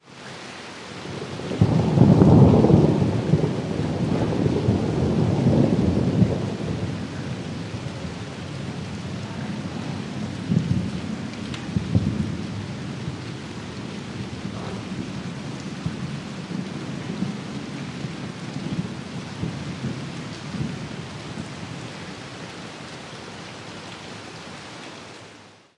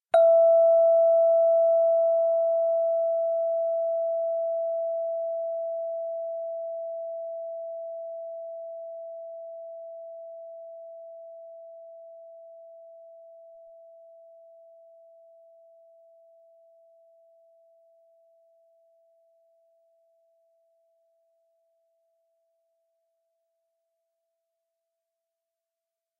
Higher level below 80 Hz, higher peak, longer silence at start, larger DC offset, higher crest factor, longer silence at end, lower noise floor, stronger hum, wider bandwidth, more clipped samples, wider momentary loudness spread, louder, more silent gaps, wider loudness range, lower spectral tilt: first, -46 dBFS vs -90 dBFS; first, -2 dBFS vs -10 dBFS; about the same, 0.05 s vs 0.15 s; neither; about the same, 22 dB vs 20 dB; second, 0.25 s vs 12.9 s; second, -48 dBFS vs -89 dBFS; neither; first, 11 kHz vs 1.6 kHz; neither; second, 17 LU vs 26 LU; about the same, -24 LUFS vs -25 LUFS; neither; second, 15 LU vs 26 LU; first, -7.5 dB/octave vs 17 dB/octave